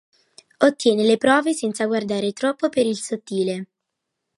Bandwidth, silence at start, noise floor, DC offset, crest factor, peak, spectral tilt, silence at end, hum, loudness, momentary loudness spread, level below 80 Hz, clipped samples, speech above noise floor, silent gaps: 11.5 kHz; 0.6 s; -80 dBFS; under 0.1%; 20 dB; -2 dBFS; -4.5 dB/octave; 0.75 s; none; -21 LUFS; 9 LU; -68 dBFS; under 0.1%; 60 dB; none